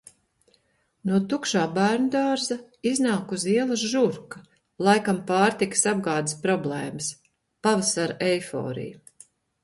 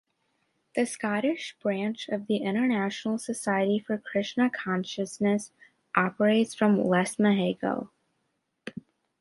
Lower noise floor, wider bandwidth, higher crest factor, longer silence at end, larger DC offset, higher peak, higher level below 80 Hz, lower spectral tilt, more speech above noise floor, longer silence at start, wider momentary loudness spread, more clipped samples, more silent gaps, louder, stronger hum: second, -67 dBFS vs -77 dBFS; about the same, 11.5 kHz vs 11.5 kHz; about the same, 20 dB vs 22 dB; first, 0.7 s vs 0.5 s; neither; about the same, -6 dBFS vs -6 dBFS; first, -66 dBFS vs -72 dBFS; second, -4 dB/octave vs -5.5 dB/octave; second, 43 dB vs 51 dB; first, 1.05 s vs 0.75 s; about the same, 10 LU vs 11 LU; neither; neither; first, -24 LUFS vs -27 LUFS; neither